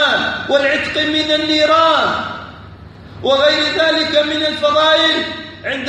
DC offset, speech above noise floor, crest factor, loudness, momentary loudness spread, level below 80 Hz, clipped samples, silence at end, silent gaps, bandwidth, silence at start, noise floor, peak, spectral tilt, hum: under 0.1%; 22 dB; 14 dB; -14 LUFS; 12 LU; -48 dBFS; under 0.1%; 0 s; none; 9.8 kHz; 0 s; -36 dBFS; -2 dBFS; -3.5 dB/octave; none